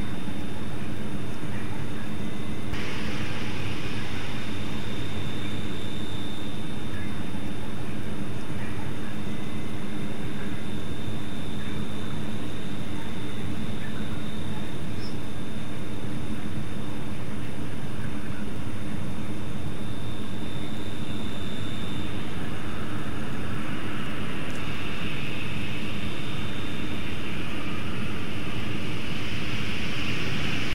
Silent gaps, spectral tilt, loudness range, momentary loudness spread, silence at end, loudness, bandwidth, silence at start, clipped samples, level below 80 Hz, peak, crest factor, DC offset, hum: none; -5.5 dB/octave; 2 LU; 3 LU; 0 s; -33 LUFS; 16 kHz; 0 s; under 0.1%; -46 dBFS; -14 dBFS; 18 dB; 10%; none